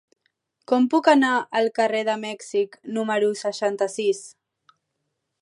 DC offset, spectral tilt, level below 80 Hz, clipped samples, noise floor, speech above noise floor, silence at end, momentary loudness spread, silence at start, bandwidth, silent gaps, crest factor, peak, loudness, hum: under 0.1%; -4 dB/octave; -80 dBFS; under 0.1%; -78 dBFS; 56 dB; 1.1 s; 10 LU; 0.7 s; 11.5 kHz; none; 20 dB; -4 dBFS; -22 LUFS; none